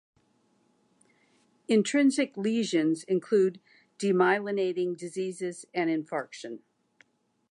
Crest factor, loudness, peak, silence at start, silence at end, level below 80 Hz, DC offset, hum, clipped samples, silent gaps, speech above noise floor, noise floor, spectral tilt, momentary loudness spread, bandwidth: 20 dB; -28 LUFS; -10 dBFS; 1.7 s; 0.95 s; -84 dBFS; under 0.1%; none; under 0.1%; none; 42 dB; -69 dBFS; -5 dB/octave; 12 LU; 11 kHz